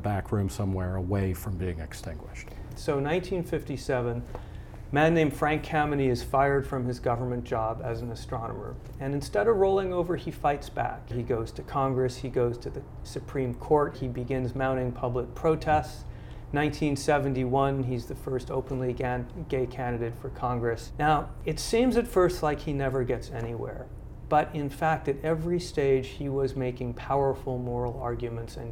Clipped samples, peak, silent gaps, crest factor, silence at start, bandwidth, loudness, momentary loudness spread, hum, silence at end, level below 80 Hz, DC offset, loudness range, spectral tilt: under 0.1%; -10 dBFS; none; 18 dB; 0 s; 17 kHz; -29 LUFS; 12 LU; none; 0 s; -42 dBFS; under 0.1%; 4 LU; -6.5 dB/octave